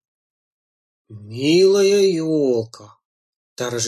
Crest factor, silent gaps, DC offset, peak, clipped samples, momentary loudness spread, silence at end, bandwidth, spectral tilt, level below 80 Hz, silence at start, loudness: 14 dB; 3.05-3.56 s; under 0.1%; -6 dBFS; under 0.1%; 16 LU; 0 s; 13 kHz; -4.5 dB/octave; -66 dBFS; 1.1 s; -17 LUFS